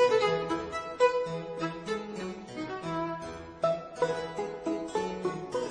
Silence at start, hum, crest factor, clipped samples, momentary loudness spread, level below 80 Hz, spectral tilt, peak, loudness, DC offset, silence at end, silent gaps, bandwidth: 0 s; none; 20 dB; under 0.1%; 11 LU; -60 dBFS; -5 dB/octave; -12 dBFS; -32 LUFS; under 0.1%; 0 s; none; 10 kHz